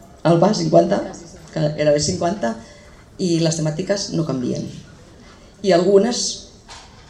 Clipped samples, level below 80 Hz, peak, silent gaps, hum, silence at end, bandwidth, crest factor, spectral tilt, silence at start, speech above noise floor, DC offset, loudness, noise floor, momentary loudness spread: under 0.1%; -48 dBFS; 0 dBFS; none; none; 0.25 s; 11.5 kHz; 20 dB; -5 dB/octave; 0.25 s; 26 dB; under 0.1%; -19 LUFS; -44 dBFS; 18 LU